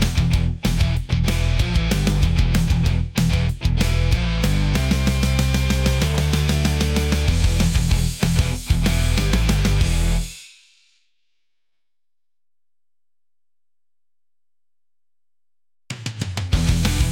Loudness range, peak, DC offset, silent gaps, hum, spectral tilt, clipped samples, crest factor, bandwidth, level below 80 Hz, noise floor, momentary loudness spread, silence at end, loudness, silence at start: 9 LU; -6 dBFS; under 0.1%; none; none; -5 dB/octave; under 0.1%; 14 dB; 17 kHz; -24 dBFS; under -90 dBFS; 3 LU; 0 s; -20 LUFS; 0 s